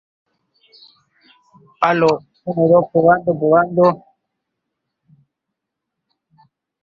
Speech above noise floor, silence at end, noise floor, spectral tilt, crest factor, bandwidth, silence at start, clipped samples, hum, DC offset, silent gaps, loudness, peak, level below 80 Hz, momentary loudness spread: 66 dB; 2.85 s; -80 dBFS; -8 dB/octave; 18 dB; 7.4 kHz; 1.8 s; under 0.1%; none; under 0.1%; none; -15 LUFS; -2 dBFS; -60 dBFS; 9 LU